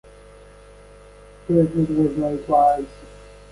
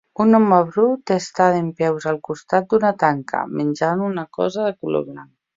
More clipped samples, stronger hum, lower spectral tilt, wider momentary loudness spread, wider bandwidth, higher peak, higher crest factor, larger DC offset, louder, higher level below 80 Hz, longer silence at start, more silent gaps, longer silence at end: neither; first, 50 Hz at -45 dBFS vs none; first, -9 dB/octave vs -7 dB/octave; first, 12 LU vs 9 LU; first, 11.5 kHz vs 7.8 kHz; second, -6 dBFS vs -2 dBFS; about the same, 18 dB vs 18 dB; neither; about the same, -20 LUFS vs -19 LUFS; first, -46 dBFS vs -62 dBFS; first, 1.5 s vs 0.2 s; neither; about the same, 0.35 s vs 0.35 s